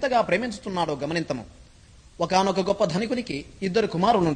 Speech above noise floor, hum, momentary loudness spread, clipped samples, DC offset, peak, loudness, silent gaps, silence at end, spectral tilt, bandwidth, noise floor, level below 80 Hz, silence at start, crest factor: 27 dB; none; 9 LU; under 0.1%; under 0.1%; -6 dBFS; -25 LUFS; none; 0 s; -5.5 dB/octave; 9.8 kHz; -51 dBFS; -52 dBFS; 0 s; 18 dB